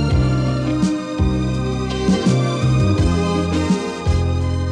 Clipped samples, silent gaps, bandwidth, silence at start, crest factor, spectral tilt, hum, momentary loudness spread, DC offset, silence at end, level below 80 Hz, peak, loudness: under 0.1%; none; 10.5 kHz; 0 s; 12 dB; -7 dB/octave; none; 4 LU; under 0.1%; 0 s; -26 dBFS; -4 dBFS; -18 LUFS